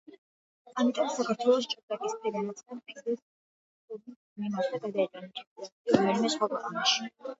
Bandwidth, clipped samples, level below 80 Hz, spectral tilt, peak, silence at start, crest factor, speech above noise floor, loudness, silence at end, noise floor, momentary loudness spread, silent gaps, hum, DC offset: 8 kHz; under 0.1%; -74 dBFS; -4 dB/octave; -6 dBFS; 0.1 s; 24 dB; over 60 dB; -30 LUFS; 0.05 s; under -90 dBFS; 18 LU; 0.18-0.65 s, 1.83-1.88 s, 3.22-3.88 s, 4.16-4.36 s, 5.47-5.56 s, 5.72-5.85 s; none; under 0.1%